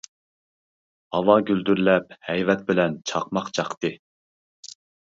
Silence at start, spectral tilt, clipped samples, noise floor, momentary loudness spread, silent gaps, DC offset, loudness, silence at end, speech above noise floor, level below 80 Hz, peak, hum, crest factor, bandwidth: 1.1 s; -5.5 dB/octave; under 0.1%; under -90 dBFS; 11 LU; 3.77-3.81 s; under 0.1%; -23 LUFS; 1.1 s; over 68 dB; -62 dBFS; -2 dBFS; none; 22 dB; 7.8 kHz